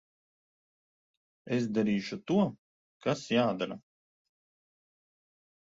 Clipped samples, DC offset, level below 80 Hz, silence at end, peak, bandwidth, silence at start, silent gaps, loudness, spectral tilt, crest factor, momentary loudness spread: under 0.1%; under 0.1%; -72 dBFS; 1.8 s; -14 dBFS; 7.8 kHz; 1.45 s; 2.58-3.00 s; -31 LUFS; -6.5 dB/octave; 20 dB; 8 LU